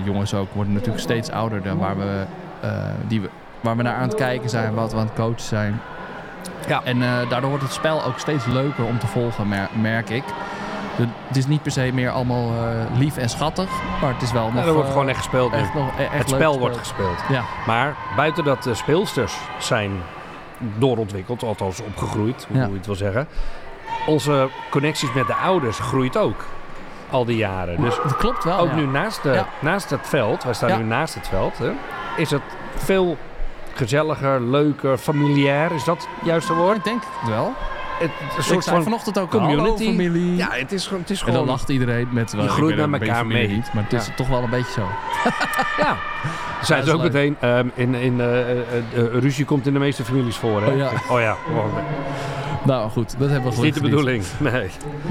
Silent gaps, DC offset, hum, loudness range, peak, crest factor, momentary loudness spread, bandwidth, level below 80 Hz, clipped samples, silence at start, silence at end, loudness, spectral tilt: none; under 0.1%; none; 4 LU; -2 dBFS; 18 dB; 8 LU; 16 kHz; -38 dBFS; under 0.1%; 0 s; 0 s; -21 LUFS; -6 dB/octave